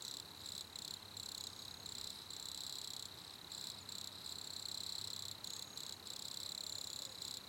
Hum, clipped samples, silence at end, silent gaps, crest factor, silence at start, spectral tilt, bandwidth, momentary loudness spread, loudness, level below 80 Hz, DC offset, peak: none; under 0.1%; 0 s; none; 18 dB; 0 s; -0.5 dB/octave; 17 kHz; 4 LU; -46 LUFS; -76 dBFS; under 0.1%; -30 dBFS